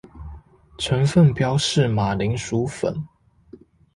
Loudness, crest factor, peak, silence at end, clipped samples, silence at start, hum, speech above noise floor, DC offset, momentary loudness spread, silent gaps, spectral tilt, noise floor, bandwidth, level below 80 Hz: -21 LUFS; 16 dB; -6 dBFS; 0.9 s; under 0.1%; 0.15 s; none; 29 dB; under 0.1%; 23 LU; none; -6 dB/octave; -49 dBFS; 11.5 kHz; -44 dBFS